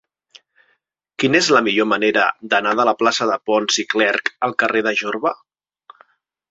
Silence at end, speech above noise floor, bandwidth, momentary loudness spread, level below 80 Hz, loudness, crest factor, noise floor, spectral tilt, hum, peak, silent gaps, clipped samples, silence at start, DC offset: 1.15 s; 49 dB; 7.8 kHz; 7 LU; -64 dBFS; -17 LUFS; 18 dB; -66 dBFS; -3 dB/octave; none; -2 dBFS; none; under 0.1%; 1.2 s; under 0.1%